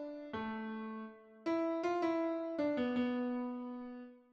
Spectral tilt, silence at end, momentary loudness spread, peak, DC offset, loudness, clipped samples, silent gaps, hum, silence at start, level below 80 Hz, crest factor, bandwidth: -6.5 dB/octave; 0.15 s; 12 LU; -22 dBFS; under 0.1%; -38 LUFS; under 0.1%; none; none; 0 s; -74 dBFS; 16 dB; 7.6 kHz